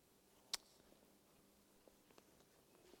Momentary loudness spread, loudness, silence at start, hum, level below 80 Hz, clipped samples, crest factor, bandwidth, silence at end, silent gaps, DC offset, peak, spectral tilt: 20 LU; -49 LUFS; 0 s; none; -86 dBFS; under 0.1%; 42 dB; 17 kHz; 0 s; none; under 0.1%; -20 dBFS; 0 dB/octave